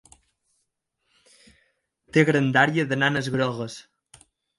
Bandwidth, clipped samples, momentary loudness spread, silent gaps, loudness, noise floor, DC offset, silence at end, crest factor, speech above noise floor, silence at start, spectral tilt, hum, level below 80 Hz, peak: 11.5 kHz; under 0.1%; 14 LU; none; -22 LUFS; -76 dBFS; under 0.1%; 0.75 s; 22 dB; 54 dB; 2.15 s; -6 dB/octave; none; -64 dBFS; -4 dBFS